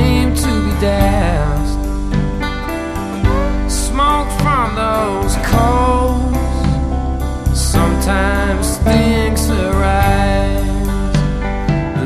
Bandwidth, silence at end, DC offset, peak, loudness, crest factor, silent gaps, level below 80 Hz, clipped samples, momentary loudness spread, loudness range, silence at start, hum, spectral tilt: 14 kHz; 0 s; under 0.1%; 0 dBFS; -16 LUFS; 14 dB; none; -18 dBFS; under 0.1%; 6 LU; 3 LU; 0 s; none; -5.5 dB/octave